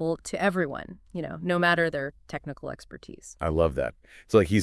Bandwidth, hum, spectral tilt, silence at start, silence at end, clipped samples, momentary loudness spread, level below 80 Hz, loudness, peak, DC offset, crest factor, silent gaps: 12 kHz; none; -6 dB/octave; 0 s; 0 s; under 0.1%; 16 LU; -48 dBFS; -27 LUFS; -8 dBFS; under 0.1%; 20 dB; none